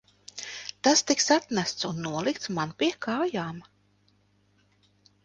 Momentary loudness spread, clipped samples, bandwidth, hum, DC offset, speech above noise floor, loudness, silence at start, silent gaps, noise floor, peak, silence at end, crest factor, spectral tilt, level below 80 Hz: 15 LU; under 0.1%; 10.5 kHz; 50 Hz at -60 dBFS; under 0.1%; 39 dB; -27 LUFS; 0.35 s; none; -66 dBFS; -8 dBFS; 1.65 s; 22 dB; -3 dB/octave; -68 dBFS